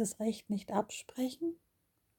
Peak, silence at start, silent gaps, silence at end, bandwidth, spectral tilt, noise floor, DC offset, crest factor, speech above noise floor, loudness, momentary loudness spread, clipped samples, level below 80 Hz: -18 dBFS; 0 s; none; 0.65 s; 18 kHz; -5 dB/octave; -78 dBFS; under 0.1%; 20 dB; 41 dB; -37 LUFS; 6 LU; under 0.1%; -74 dBFS